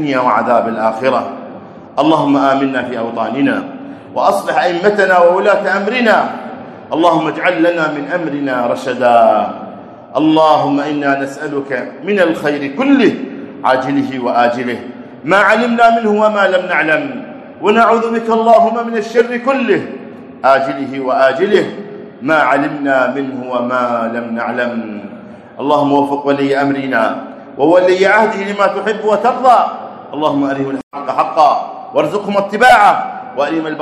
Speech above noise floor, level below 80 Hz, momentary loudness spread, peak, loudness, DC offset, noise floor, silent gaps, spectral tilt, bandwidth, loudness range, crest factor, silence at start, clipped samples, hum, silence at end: 20 dB; -58 dBFS; 14 LU; 0 dBFS; -13 LUFS; under 0.1%; -33 dBFS; 30.83-30.91 s; -5.5 dB/octave; 13 kHz; 3 LU; 14 dB; 0 s; 0.2%; none; 0 s